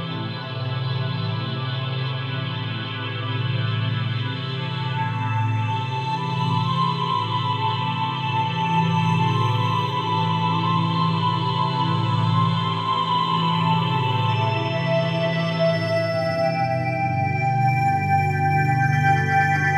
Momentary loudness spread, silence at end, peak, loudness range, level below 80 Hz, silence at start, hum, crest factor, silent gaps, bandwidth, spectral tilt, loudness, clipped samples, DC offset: 7 LU; 0 s; -6 dBFS; 5 LU; -66 dBFS; 0 s; none; 16 dB; none; 8.4 kHz; -7 dB/octave; -22 LUFS; under 0.1%; under 0.1%